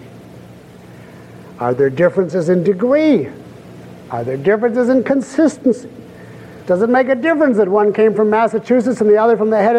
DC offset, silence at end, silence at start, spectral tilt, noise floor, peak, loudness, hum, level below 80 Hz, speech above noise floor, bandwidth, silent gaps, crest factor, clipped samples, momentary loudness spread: under 0.1%; 0 s; 0.05 s; -7.5 dB/octave; -38 dBFS; -2 dBFS; -14 LUFS; none; -58 dBFS; 25 dB; 10 kHz; none; 12 dB; under 0.1%; 11 LU